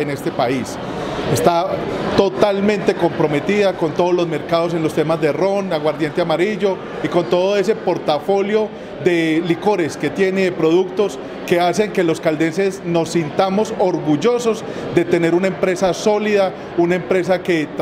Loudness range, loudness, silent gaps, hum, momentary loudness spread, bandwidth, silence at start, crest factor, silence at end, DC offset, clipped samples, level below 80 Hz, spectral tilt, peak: 1 LU; -18 LUFS; none; none; 5 LU; 15.5 kHz; 0 s; 16 dB; 0 s; under 0.1%; under 0.1%; -50 dBFS; -6 dB/octave; 0 dBFS